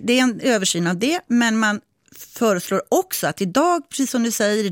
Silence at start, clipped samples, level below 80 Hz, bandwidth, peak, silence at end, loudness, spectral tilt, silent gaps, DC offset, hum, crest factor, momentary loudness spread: 0 s; under 0.1%; -66 dBFS; 17 kHz; -6 dBFS; 0 s; -20 LUFS; -3.5 dB/octave; none; under 0.1%; none; 14 dB; 4 LU